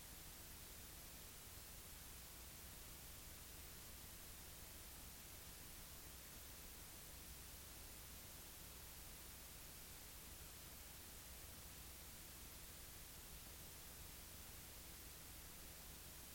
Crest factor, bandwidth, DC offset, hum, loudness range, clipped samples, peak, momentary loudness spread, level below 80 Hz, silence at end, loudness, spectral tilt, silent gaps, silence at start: 16 dB; 17 kHz; under 0.1%; none; 0 LU; under 0.1%; -42 dBFS; 0 LU; -64 dBFS; 0 s; -56 LUFS; -2 dB/octave; none; 0 s